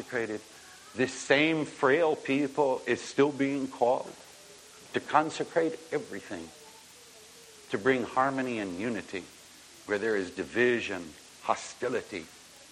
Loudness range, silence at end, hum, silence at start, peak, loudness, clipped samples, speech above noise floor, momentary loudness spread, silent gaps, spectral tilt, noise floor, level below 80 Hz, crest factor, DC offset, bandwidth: 5 LU; 0.05 s; none; 0 s; -8 dBFS; -30 LUFS; under 0.1%; 23 dB; 23 LU; none; -4.5 dB/octave; -53 dBFS; -70 dBFS; 24 dB; under 0.1%; 14.5 kHz